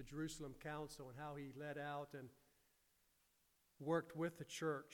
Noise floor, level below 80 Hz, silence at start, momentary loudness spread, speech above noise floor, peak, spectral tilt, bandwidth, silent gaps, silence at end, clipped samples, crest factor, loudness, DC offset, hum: -80 dBFS; -72 dBFS; 0 s; 10 LU; 33 dB; -28 dBFS; -5.5 dB/octave; 19 kHz; none; 0 s; under 0.1%; 20 dB; -48 LUFS; under 0.1%; none